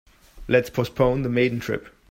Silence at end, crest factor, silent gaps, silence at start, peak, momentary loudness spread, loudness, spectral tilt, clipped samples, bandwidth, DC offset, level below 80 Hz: 0.2 s; 18 dB; none; 0.35 s; -4 dBFS; 10 LU; -23 LUFS; -7 dB/octave; under 0.1%; 16 kHz; under 0.1%; -44 dBFS